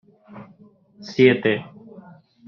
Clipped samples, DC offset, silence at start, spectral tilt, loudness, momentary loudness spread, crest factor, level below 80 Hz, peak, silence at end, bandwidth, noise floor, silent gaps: under 0.1%; under 0.1%; 0.35 s; -5 dB/octave; -19 LUFS; 26 LU; 22 dB; -64 dBFS; -2 dBFS; 0.85 s; 6.8 kHz; -52 dBFS; none